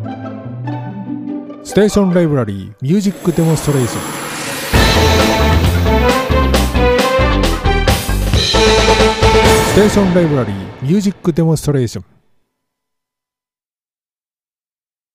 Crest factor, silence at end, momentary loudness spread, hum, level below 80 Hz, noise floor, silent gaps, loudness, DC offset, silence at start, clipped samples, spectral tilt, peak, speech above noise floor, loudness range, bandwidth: 14 dB; 3.1 s; 14 LU; none; -22 dBFS; under -90 dBFS; none; -13 LUFS; under 0.1%; 0 s; under 0.1%; -5 dB/octave; 0 dBFS; over 77 dB; 8 LU; 15.5 kHz